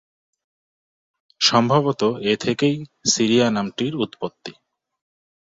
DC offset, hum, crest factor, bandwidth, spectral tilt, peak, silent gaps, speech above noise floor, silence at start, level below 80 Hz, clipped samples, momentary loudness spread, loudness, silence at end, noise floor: under 0.1%; none; 20 dB; 7.8 kHz; -4 dB/octave; -2 dBFS; none; over 70 dB; 1.4 s; -60 dBFS; under 0.1%; 13 LU; -20 LUFS; 0.9 s; under -90 dBFS